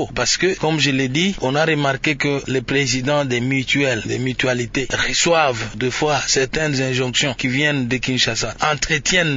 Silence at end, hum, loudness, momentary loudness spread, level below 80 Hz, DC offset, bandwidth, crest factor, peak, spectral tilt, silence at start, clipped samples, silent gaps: 0 s; none; -18 LUFS; 4 LU; -40 dBFS; under 0.1%; 7.8 kHz; 16 dB; -2 dBFS; -3.5 dB/octave; 0 s; under 0.1%; none